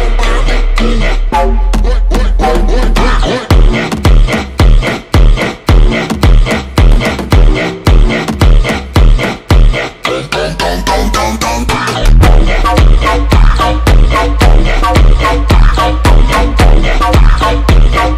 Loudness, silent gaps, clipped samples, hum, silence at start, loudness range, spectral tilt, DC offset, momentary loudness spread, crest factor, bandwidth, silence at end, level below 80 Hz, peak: -10 LUFS; none; under 0.1%; none; 0 s; 2 LU; -5.5 dB/octave; under 0.1%; 4 LU; 6 dB; 13.5 kHz; 0 s; -8 dBFS; 0 dBFS